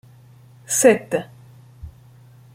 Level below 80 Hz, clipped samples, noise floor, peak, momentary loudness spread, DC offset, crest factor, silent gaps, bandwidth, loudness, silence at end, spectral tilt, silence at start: -52 dBFS; under 0.1%; -48 dBFS; -2 dBFS; 26 LU; under 0.1%; 22 dB; none; 16.5 kHz; -18 LUFS; 0.65 s; -3.5 dB/octave; 0.7 s